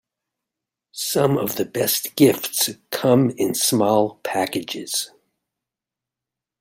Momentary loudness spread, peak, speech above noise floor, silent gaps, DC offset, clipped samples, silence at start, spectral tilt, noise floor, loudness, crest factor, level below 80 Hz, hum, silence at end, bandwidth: 8 LU; -2 dBFS; 67 dB; none; under 0.1%; under 0.1%; 0.95 s; -4 dB/octave; -87 dBFS; -20 LUFS; 20 dB; -64 dBFS; none; 1.55 s; 16.5 kHz